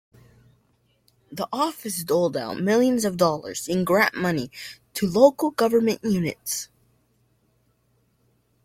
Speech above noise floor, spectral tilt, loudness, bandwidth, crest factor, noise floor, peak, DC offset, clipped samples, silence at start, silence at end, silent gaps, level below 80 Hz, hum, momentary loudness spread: 44 dB; -5 dB/octave; -23 LUFS; 16.5 kHz; 22 dB; -66 dBFS; -2 dBFS; under 0.1%; under 0.1%; 1.3 s; 2 s; none; -62 dBFS; none; 14 LU